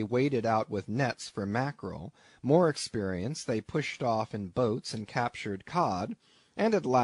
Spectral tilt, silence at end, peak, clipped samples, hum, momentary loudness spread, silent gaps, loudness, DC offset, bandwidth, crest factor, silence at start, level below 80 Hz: -6 dB/octave; 0 s; -12 dBFS; under 0.1%; none; 13 LU; none; -31 LUFS; under 0.1%; 11 kHz; 18 dB; 0 s; -64 dBFS